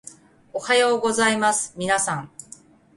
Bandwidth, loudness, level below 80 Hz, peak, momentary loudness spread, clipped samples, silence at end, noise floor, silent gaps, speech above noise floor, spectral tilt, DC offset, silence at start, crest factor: 11.5 kHz; -21 LUFS; -62 dBFS; -6 dBFS; 15 LU; under 0.1%; 0.7 s; -48 dBFS; none; 27 dB; -2.5 dB/octave; under 0.1%; 0.05 s; 18 dB